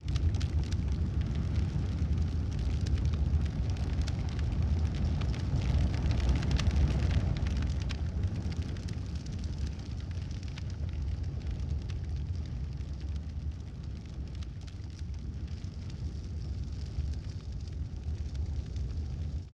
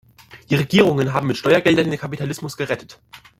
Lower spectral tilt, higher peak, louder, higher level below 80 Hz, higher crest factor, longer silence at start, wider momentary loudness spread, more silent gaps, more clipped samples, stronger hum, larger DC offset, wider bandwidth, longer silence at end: about the same, -7 dB/octave vs -6 dB/octave; second, -16 dBFS vs -2 dBFS; second, -34 LUFS vs -19 LUFS; first, -34 dBFS vs -54 dBFS; about the same, 16 dB vs 18 dB; second, 0 s vs 0.35 s; about the same, 10 LU vs 11 LU; neither; neither; neither; neither; second, 8.4 kHz vs 16 kHz; second, 0 s vs 0.2 s